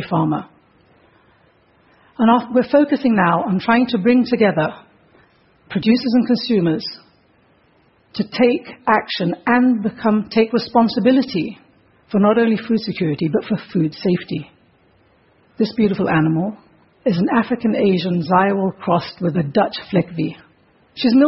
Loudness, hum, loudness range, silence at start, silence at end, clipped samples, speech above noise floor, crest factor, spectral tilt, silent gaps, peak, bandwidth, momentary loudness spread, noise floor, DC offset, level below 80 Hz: -18 LUFS; none; 4 LU; 0 s; 0 s; under 0.1%; 39 dB; 18 dB; -10.5 dB/octave; none; 0 dBFS; 5.8 kHz; 9 LU; -56 dBFS; under 0.1%; -56 dBFS